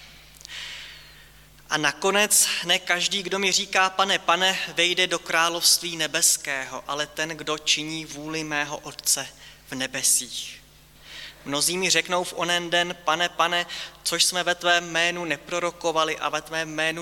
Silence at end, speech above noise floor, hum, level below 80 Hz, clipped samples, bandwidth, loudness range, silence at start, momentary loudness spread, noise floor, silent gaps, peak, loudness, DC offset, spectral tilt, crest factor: 0 s; 26 dB; none; -60 dBFS; under 0.1%; 17.5 kHz; 5 LU; 0 s; 13 LU; -50 dBFS; none; -6 dBFS; -22 LUFS; under 0.1%; -1 dB/octave; 20 dB